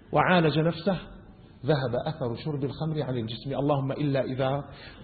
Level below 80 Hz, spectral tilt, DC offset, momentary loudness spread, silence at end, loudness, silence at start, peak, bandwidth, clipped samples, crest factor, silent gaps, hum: -54 dBFS; -11 dB/octave; under 0.1%; 11 LU; 0 s; -28 LUFS; 0.1 s; -10 dBFS; 4.8 kHz; under 0.1%; 18 dB; none; none